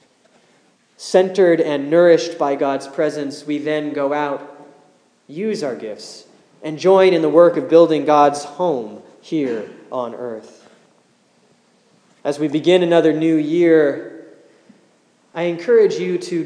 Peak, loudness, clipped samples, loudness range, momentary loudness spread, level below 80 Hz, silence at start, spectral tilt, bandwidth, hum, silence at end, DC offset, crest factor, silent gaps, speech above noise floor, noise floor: 0 dBFS; -17 LUFS; under 0.1%; 11 LU; 17 LU; -82 dBFS; 1 s; -6 dB/octave; 10.5 kHz; none; 0 s; under 0.1%; 18 dB; none; 41 dB; -57 dBFS